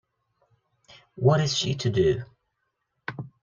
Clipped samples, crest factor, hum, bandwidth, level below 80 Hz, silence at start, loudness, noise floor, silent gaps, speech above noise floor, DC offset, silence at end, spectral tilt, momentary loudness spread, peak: under 0.1%; 20 dB; none; 7.6 kHz; -56 dBFS; 1.15 s; -24 LUFS; -78 dBFS; none; 55 dB; under 0.1%; 0.15 s; -5.5 dB/octave; 17 LU; -8 dBFS